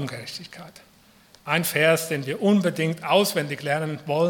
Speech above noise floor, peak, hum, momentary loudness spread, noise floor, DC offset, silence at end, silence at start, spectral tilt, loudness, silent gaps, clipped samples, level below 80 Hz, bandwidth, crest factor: 31 dB; -6 dBFS; none; 16 LU; -54 dBFS; under 0.1%; 0 s; 0 s; -4.5 dB/octave; -23 LUFS; none; under 0.1%; -70 dBFS; 18 kHz; 20 dB